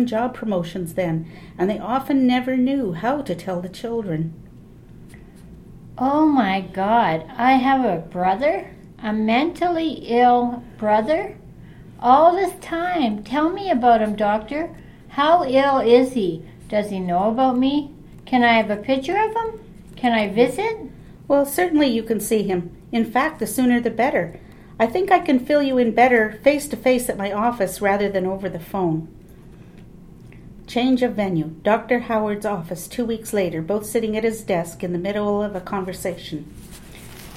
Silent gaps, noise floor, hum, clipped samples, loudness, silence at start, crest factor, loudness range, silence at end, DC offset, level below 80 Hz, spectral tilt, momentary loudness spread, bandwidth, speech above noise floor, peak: none; -43 dBFS; none; under 0.1%; -20 LUFS; 0 s; 18 dB; 6 LU; 0 s; under 0.1%; -48 dBFS; -5.5 dB/octave; 12 LU; 16 kHz; 23 dB; -2 dBFS